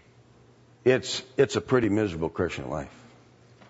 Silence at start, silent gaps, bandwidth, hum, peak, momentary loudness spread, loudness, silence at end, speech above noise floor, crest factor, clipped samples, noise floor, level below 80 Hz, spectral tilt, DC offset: 0.85 s; none; 8 kHz; none; -8 dBFS; 11 LU; -26 LUFS; 0.8 s; 30 dB; 20 dB; under 0.1%; -56 dBFS; -54 dBFS; -5.5 dB/octave; under 0.1%